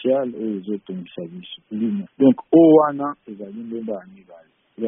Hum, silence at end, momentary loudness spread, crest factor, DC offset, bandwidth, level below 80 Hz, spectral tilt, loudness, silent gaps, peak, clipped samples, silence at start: none; 0 s; 21 LU; 18 dB; under 0.1%; 3.7 kHz; -66 dBFS; -6 dB/octave; -19 LUFS; none; -2 dBFS; under 0.1%; 0 s